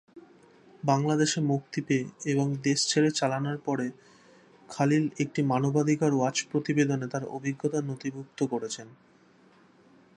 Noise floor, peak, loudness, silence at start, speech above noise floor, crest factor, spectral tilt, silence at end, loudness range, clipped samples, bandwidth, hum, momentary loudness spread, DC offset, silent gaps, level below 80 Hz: -59 dBFS; -10 dBFS; -28 LUFS; 0.15 s; 32 dB; 18 dB; -5 dB/octave; 1.2 s; 4 LU; under 0.1%; 11 kHz; none; 9 LU; under 0.1%; none; -74 dBFS